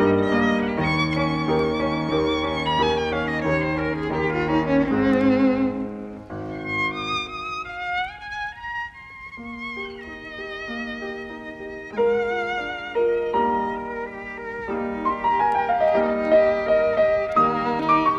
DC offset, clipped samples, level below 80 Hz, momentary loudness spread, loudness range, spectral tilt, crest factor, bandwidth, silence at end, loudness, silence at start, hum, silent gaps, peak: under 0.1%; under 0.1%; -46 dBFS; 14 LU; 10 LU; -6.5 dB/octave; 16 dB; 9.4 kHz; 0 s; -23 LUFS; 0 s; none; none; -6 dBFS